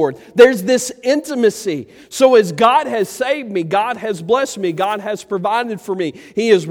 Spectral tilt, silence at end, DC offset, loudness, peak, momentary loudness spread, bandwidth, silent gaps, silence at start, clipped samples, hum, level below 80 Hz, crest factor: -4.5 dB/octave; 0 s; under 0.1%; -16 LUFS; 0 dBFS; 12 LU; 16.5 kHz; none; 0 s; under 0.1%; none; -60 dBFS; 16 dB